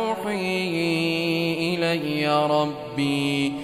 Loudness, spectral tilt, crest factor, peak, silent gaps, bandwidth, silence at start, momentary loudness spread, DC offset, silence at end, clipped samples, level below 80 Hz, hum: -23 LUFS; -5.5 dB/octave; 16 dB; -8 dBFS; none; 15.5 kHz; 0 s; 4 LU; under 0.1%; 0 s; under 0.1%; -60 dBFS; none